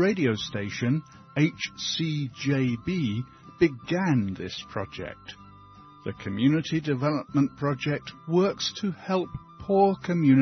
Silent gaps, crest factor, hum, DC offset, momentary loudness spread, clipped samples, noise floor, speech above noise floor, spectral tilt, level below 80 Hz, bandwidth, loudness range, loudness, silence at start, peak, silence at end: none; 18 dB; none; under 0.1%; 13 LU; under 0.1%; -50 dBFS; 24 dB; -6 dB/octave; -58 dBFS; 6.4 kHz; 3 LU; -27 LUFS; 0 s; -8 dBFS; 0 s